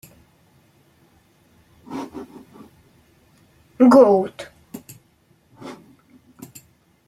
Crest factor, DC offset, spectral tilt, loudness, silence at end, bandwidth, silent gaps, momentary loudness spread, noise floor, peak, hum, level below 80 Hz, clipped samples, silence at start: 22 dB; under 0.1%; -7 dB/octave; -16 LUFS; 1.35 s; 13.5 kHz; none; 30 LU; -59 dBFS; -2 dBFS; none; -64 dBFS; under 0.1%; 1.9 s